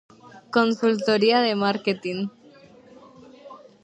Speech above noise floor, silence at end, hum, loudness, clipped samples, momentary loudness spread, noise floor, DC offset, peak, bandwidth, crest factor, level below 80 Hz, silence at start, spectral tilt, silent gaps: 29 dB; 0.25 s; none; -22 LUFS; under 0.1%; 11 LU; -50 dBFS; under 0.1%; -4 dBFS; 8.8 kHz; 20 dB; -70 dBFS; 0.35 s; -5.5 dB/octave; none